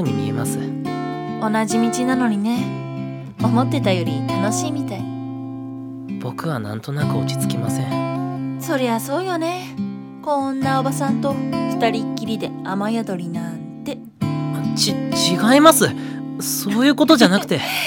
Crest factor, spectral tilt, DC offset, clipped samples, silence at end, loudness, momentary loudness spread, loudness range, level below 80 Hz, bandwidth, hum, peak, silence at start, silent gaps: 20 dB; -5 dB/octave; under 0.1%; under 0.1%; 0 s; -20 LUFS; 14 LU; 7 LU; -58 dBFS; 18 kHz; none; 0 dBFS; 0 s; none